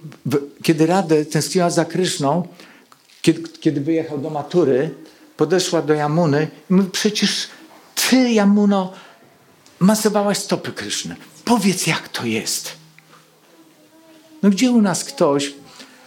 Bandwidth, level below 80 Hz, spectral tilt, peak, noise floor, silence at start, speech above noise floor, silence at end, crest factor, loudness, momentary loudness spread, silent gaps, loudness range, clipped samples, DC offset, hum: 17 kHz; -68 dBFS; -4.5 dB/octave; -2 dBFS; -51 dBFS; 0.05 s; 33 dB; 0.2 s; 18 dB; -18 LUFS; 9 LU; none; 4 LU; under 0.1%; under 0.1%; none